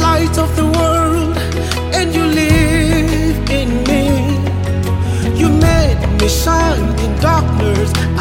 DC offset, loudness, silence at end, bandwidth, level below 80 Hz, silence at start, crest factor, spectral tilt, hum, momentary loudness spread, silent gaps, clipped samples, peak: under 0.1%; -14 LUFS; 0 s; 17 kHz; -20 dBFS; 0 s; 12 dB; -5.5 dB/octave; none; 5 LU; none; under 0.1%; 0 dBFS